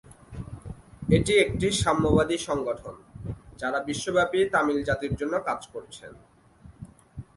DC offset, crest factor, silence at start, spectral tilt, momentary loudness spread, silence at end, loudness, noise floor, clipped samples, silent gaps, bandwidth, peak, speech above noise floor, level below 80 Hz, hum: under 0.1%; 20 dB; 0.1 s; -5 dB/octave; 22 LU; 0.15 s; -25 LUFS; -52 dBFS; under 0.1%; none; 11.5 kHz; -6 dBFS; 27 dB; -44 dBFS; none